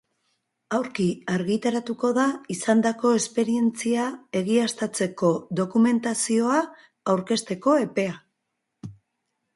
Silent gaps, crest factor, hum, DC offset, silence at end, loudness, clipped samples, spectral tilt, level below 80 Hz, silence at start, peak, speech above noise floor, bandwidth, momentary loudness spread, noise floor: none; 18 dB; none; under 0.1%; 0.65 s; -24 LUFS; under 0.1%; -5 dB/octave; -68 dBFS; 0.7 s; -8 dBFS; 56 dB; 11.5 kHz; 8 LU; -79 dBFS